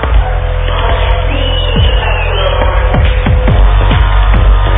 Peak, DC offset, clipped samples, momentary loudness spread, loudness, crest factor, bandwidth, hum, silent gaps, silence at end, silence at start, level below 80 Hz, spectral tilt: 0 dBFS; under 0.1%; under 0.1%; 3 LU; -11 LUFS; 8 dB; 3.9 kHz; none; none; 0 s; 0 s; -10 dBFS; -9.5 dB/octave